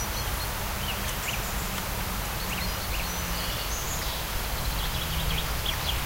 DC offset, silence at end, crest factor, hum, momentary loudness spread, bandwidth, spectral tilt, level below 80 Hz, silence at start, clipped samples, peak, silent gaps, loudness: under 0.1%; 0 s; 16 dB; none; 2 LU; 16 kHz; -3 dB/octave; -34 dBFS; 0 s; under 0.1%; -14 dBFS; none; -29 LUFS